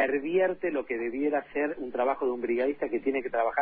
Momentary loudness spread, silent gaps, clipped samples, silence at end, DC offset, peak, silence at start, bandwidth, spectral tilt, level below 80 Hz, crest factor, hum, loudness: 5 LU; none; under 0.1%; 0 s; under 0.1%; -12 dBFS; 0 s; 4.5 kHz; -9.5 dB/octave; -64 dBFS; 16 dB; none; -29 LUFS